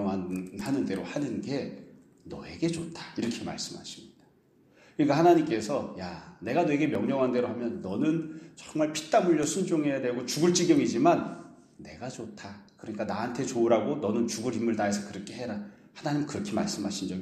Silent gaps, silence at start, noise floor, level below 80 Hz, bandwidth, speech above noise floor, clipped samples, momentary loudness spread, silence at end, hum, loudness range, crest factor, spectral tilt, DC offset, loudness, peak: none; 0 s; -62 dBFS; -66 dBFS; 14 kHz; 34 dB; under 0.1%; 18 LU; 0 s; none; 7 LU; 20 dB; -5 dB/octave; under 0.1%; -29 LUFS; -8 dBFS